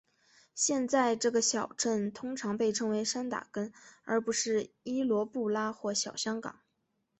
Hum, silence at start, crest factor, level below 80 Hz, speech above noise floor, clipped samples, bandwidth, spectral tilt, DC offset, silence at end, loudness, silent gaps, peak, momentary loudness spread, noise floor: none; 0.55 s; 18 dB; -74 dBFS; 48 dB; under 0.1%; 8.6 kHz; -3 dB/octave; under 0.1%; 0.7 s; -32 LUFS; none; -16 dBFS; 11 LU; -79 dBFS